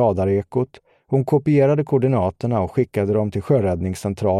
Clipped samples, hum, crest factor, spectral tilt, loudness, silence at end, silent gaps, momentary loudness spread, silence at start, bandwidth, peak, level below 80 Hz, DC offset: under 0.1%; none; 14 dB; -8.5 dB/octave; -20 LUFS; 0 s; none; 8 LU; 0 s; 13 kHz; -4 dBFS; -48 dBFS; under 0.1%